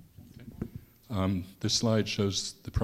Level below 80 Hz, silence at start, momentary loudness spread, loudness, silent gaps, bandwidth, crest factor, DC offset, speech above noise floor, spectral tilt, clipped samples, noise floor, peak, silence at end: -48 dBFS; 0.2 s; 21 LU; -30 LUFS; none; 15 kHz; 18 dB; under 0.1%; 20 dB; -4.5 dB/octave; under 0.1%; -50 dBFS; -14 dBFS; 0 s